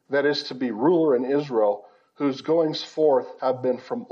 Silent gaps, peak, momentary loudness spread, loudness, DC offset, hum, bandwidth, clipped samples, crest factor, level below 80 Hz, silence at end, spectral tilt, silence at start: none; -8 dBFS; 7 LU; -23 LUFS; under 0.1%; none; 7.4 kHz; under 0.1%; 14 dB; -84 dBFS; 0.05 s; -6 dB/octave; 0.1 s